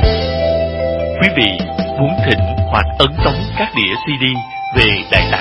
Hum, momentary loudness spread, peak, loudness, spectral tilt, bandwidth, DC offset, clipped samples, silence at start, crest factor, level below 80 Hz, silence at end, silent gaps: none; 6 LU; 0 dBFS; -14 LUFS; -7 dB/octave; 11 kHz; under 0.1%; under 0.1%; 0 s; 14 dB; -24 dBFS; 0 s; none